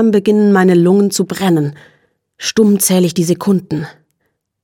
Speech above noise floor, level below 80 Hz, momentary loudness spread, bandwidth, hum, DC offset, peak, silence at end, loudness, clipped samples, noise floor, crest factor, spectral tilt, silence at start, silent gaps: 56 dB; -58 dBFS; 13 LU; 17.5 kHz; none; under 0.1%; 0 dBFS; 0.75 s; -13 LUFS; under 0.1%; -68 dBFS; 12 dB; -5.5 dB/octave; 0 s; none